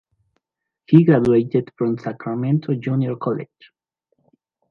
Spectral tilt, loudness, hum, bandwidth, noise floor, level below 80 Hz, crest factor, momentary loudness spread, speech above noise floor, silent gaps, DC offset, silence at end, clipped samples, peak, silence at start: -10.5 dB/octave; -19 LUFS; none; 5.6 kHz; -81 dBFS; -58 dBFS; 20 dB; 13 LU; 63 dB; none; under 0.1%; 1.25 s; under 0.1%; 0 dBFS; 0.9 s